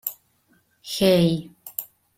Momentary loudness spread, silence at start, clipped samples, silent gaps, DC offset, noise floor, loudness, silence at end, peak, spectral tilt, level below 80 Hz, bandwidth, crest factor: 15 LU; 0.05 s; under 0.1%; none; under 0.1%; -64 dBFS; -23 LUFS; 0.35 s; -6 dBFS; -5.5 dB/octave; -56 dBFS; 16.5 kHz; 18 dB